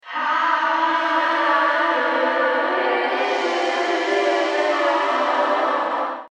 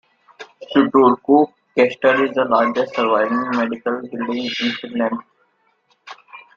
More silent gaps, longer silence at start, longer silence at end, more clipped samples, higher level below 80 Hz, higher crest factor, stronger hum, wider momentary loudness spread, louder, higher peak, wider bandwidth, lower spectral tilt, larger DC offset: neither; second, 0.05 s vs 0.4 s; second, 0.05 s vs 0.2 s; neither; second, under -90 dBFS vs -64 dBFS; second, 12 dB vs 18 dB; neither; second, 3 LU vs 10 LU; about the same, -19 LUFS vs -18 LUFS; second, -6 dBFS vs -2 dBFS; first, 10.5 kHz vs 7.2 kHz; second, -1 dB/octave vs -5.5 dB/octave; neither